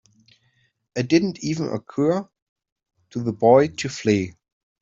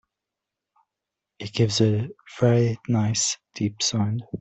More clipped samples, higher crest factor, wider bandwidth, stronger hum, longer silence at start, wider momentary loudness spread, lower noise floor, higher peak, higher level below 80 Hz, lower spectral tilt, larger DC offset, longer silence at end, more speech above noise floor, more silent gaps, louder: neither; about the same, 20 dB vs 18 dB; about the same, 7.8 kHz vs 8.4 kHz; neither; second, 0.95 s vs 1.4 s; first, 13 LU vs 9 LU; second, -66 dBFS vs -86 dBFS; about the same, -4 dBFS vs -6 dBFS; about the same, -62 dBFS vs -60 dBFS; about the same, -6 dB/octave vs -5 dB/octave; neither; first, 0.5 s vs 0 s; second, 45 dB vs 63 dB; first, 2.42-2.56 s, 2.72-2.76 s vs none; about the same, -21 LUFS vs -23 LUFS